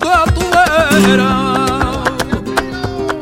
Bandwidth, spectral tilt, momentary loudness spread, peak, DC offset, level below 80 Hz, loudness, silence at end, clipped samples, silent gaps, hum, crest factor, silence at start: 16.5 kHz; -5 dB/octave; 9 LU; 0 dBFS; under 0.1%; -28 dBFS; -13 LUFS; 0 s; under 0.1%; none; none; 12 dB; 0 s